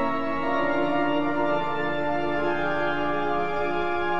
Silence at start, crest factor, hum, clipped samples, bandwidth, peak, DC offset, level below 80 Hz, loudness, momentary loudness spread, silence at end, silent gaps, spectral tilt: 0 s; 12 dB; none; under 0.1%; 7.4 kHz; -12 dBFS; 3%; -52 dBFS; -26 LUFS; 2 LU; 0 s; none; -7 dB/octave